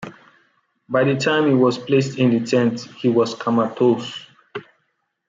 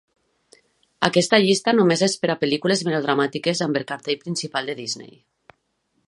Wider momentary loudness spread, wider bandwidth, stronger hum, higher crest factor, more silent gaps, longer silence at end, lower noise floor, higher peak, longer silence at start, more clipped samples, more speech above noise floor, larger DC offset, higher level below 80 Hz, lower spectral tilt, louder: first, 19 LU vs 10 LU; second, 7.8 kHz vs 11.5 kHz; neither; second, 16 dB vs 22 dB; neither; second, 0.65 s vs 1 s; about the same, -71 dBFS vs -71 dBFS; second, -4 dBFS vs 0 dBFS; second, 0 s vs 1 s; neither; about the same, 53 dB vs 50 dB; neither; about the same, -66 dBFS vs -64 dBFS; first, -6.5 dB/octave vs -4 dB/octave; about the same, -19 LUFS vs -21 LUFS